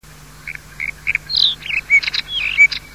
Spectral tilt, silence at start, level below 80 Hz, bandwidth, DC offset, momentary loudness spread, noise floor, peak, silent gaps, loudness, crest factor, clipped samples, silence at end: 0 dB/octave; 0.3 s; -44 dBFS; 16 kHz; 0.3%; 20 LU; -36 dBFS; -2 dBFS; none; -15 LUFS; 18 dB; under 0.1%; 0 s